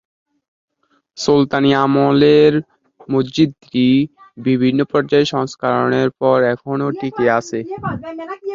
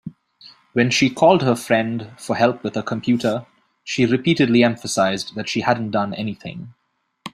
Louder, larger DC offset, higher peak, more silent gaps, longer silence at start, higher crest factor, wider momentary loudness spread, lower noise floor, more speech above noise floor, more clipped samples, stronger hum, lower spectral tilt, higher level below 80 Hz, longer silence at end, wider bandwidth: first, -16 LUFS vs -19 LUFS; neither; about the same, -2 dBFS vs -2 dBFS; neither; first, 1.15 s vs 0.05 s; about the same, 16 dB vs 18 dB; about the same, 12 LU vs 14 LU; first, -62 dBFS vs -49 dBFS; first, 47 dB vs 30 dB; neither; neither; first, -6.5 dB/octave vs -5 dB/octave; about the same, -54 dBFS vs -58 dBFS; about the same, 0 s vs 0.05 s; second, 7.6 kHz vs 14 kHz